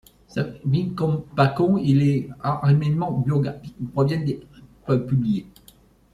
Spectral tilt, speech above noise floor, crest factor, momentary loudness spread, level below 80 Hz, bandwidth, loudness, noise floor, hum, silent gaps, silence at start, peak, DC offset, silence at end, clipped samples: -9 dB/octave; 32 dB; 18 dB; 10 LU; -52 dBFS; 7.4 kHz; -22 LUFS; -53 dBFS; none; none; 0.35 s; -4 dBFS; under 0.1%; 0.7 s; under 0.1%